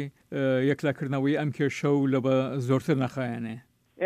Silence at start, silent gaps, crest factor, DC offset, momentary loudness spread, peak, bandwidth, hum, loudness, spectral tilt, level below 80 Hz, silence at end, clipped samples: 0 s; none; 14 dB; under 0.1%; 9 LU; -12 dBFS; 12 kHz; none; -27 LUFS; -7.5 dB/octave; -70 dBFS; 0 s; under 0.1%